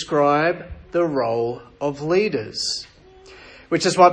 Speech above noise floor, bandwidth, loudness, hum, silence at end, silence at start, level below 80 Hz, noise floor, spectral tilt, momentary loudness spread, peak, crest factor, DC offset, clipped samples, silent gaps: 26 dB; 10 kHz; -21 LUFS; none; 0 s; 0 s; -50 dBFS; -46 dBFS; -4.5 dB/octave; 10 LU; 0 dBFS; 20 dB; under 0.1%; under 0.1%; none